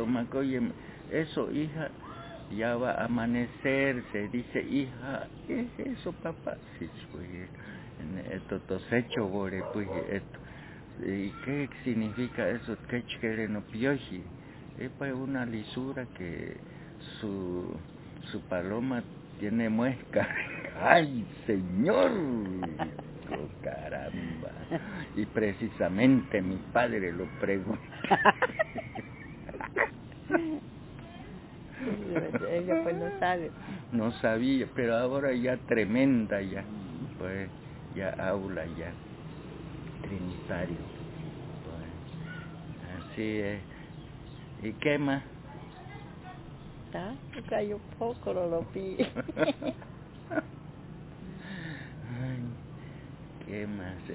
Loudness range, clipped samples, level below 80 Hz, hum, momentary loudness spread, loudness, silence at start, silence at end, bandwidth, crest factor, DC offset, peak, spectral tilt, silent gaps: 10 LU; under 0.1%; -54 dBFS; none; 17 LU; -32 LUFS; 0 s; 0 s; 4 kHz; 28 dB; under 0.1%; -4 dBFS; -5.5 dB/octave; none